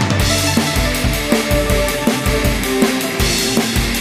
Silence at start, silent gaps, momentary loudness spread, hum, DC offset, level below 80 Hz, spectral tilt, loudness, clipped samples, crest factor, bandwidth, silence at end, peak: 0 s; none; 2 LU; none; under 0.1%; -24 dBFS; -4 dB/octave; -15 LUFS; under 0.1%; 16 dB; 16 kHz; 0 s; 0 dBFS